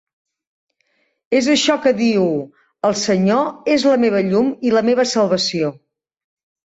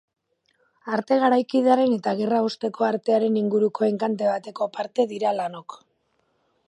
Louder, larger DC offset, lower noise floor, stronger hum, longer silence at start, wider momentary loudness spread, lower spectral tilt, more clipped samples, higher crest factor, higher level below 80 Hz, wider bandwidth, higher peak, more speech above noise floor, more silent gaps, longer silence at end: first, -17 LUFS vs -23 LUFS; neither; second, -65 dBFS vs -70 dBFS; neither; first, 1.3 s vs 0.85 s; second, 6 LU vs 9 LU; second, -4.5 dB/octave vs -6.5 dB/octave; neither; about the same, 14 dB vs 18 dB; first, -60 dBFS vs -76 dBFS; second, 8.2 kHz vs 10.5 kHz; about the same, -4 dBFS vs -4 dBFS; about the same, 50 dB vs 47 dB; neither; about the same, 0.9 s vs 0.9 s